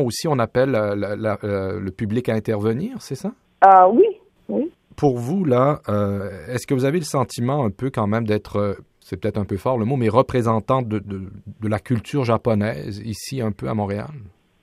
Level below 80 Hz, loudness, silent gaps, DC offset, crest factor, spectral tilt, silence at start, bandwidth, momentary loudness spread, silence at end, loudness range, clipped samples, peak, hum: -52 dBFS; -21 LUFS; none; under 0.1%; 20 dB; -7 dB/octave; 0 s; 15 kHz; 12 LU; 0.35 s; 6 LU; under 0.1%; 0 dBFS; none